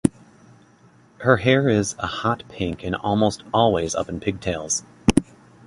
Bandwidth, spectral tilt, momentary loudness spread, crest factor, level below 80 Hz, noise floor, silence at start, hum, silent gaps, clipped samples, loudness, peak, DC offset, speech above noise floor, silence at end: 11.5 kHz; -5 dB/octave; 9 LU; 22 dB; -42 dBFS; -53 dBFS; 0.05 s; none; none; under 0.1%; -22 LUFS; 0 dBFS; under 0.1%; 32 dB; 0.45 s